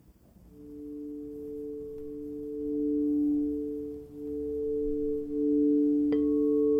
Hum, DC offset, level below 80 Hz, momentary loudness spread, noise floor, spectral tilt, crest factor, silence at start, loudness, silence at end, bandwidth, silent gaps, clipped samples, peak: none; under 0.1%; -52 dBFS; 15 LU; -56 dBFS; -10 dB/octave; 12 dB; 0.1 s; -30 LUFS; 0 s; 3.3 kHz; none; under 0.1%; -18 dBFS